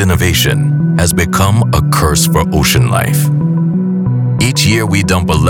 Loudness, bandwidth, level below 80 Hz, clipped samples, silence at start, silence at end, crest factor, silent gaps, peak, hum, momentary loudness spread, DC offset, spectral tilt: -11 LUFS; 18.5 kHz; -26 dBFS; under 0.1%; 0 s; 0 s; 10 dB; none; 0 dBFS; none; 3 LU; under 0.1%; -5 dB/octave